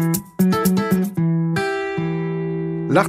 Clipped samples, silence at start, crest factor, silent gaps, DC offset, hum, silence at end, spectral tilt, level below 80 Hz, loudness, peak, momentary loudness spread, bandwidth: under 0.1%; 0 s; 18 dB; none; under 0.1%; none; 0 s; -6.5 dB/octave; -52 dBFS; -20 LUFS; 0 dBFS; 6 LU; 15.5 kHz